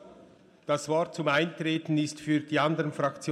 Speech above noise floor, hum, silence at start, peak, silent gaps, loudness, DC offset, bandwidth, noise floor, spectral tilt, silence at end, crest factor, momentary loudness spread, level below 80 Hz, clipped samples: 28 dB; none; 0 s; -12 dBFS; none; -28 LUFS; under 0.1%; 12.5 kHz; -56 dBFS; -5.5 dB/octave; 0 s; 16 dB; 5 LU; -74 dBFS; under 0.1%